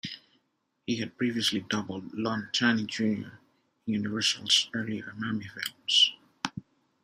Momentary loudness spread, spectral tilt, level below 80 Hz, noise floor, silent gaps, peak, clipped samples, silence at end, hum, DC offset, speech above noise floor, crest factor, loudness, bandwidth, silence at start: 15 LU; -3 dB/octave; -72 dBFS; -76 dBFS; none; -8 dBFS; under 0.1%; 0.45 s; none; under 0.1%; 47 dB; 22 dB; -28 LUFS; 15.5 kHz; 0.05 s